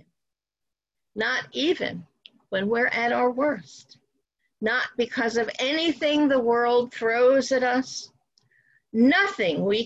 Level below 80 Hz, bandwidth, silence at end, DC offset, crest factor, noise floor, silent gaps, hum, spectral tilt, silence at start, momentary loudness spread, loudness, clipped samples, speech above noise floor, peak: -66 dBFS; 8 kHz; 0 s; under 0.1%; 14 dB; -87 dBFS; none; none; -4 dB/octave; 1.15 s; 11 LU; -23 LUFS; under 0.1%; 63 dB; -10 dBFS